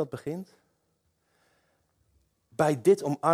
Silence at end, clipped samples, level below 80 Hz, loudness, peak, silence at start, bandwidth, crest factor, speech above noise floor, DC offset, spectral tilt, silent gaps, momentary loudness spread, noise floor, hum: 0 s; under 0.1%; -70 dBFS; -26 LUFS; -8 dBFS; 0 s; 15 kHz; 20 dB; 48 dB; under 0.1%; -6.5 dB/octave; none; 16 LU; -74 dBFS; none